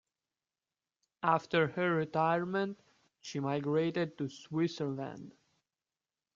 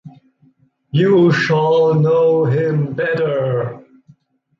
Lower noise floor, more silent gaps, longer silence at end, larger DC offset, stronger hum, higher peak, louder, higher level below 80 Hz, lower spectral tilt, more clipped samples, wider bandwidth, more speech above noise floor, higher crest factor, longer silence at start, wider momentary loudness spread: first, under -90 dBFS vs -55 dBFS; neither; first, 1.05 s vs 0.8 s; neither; neither; second, -14 dBFS vs -4 dBFS; second, -33 LUFS vs -15 LUFS; second, -76 dBFS vs -58 dBFS; second, -6.5 dB/octave vs -8 dB/octave; neither; about the same, 7.6 kHz vs 7.4 kHz; first, over 57 dB vs 41 dB; first, 22 dB vs 14 dB; first, 1.25 s vs 0.05 s; first, 12 LU vs 8 LU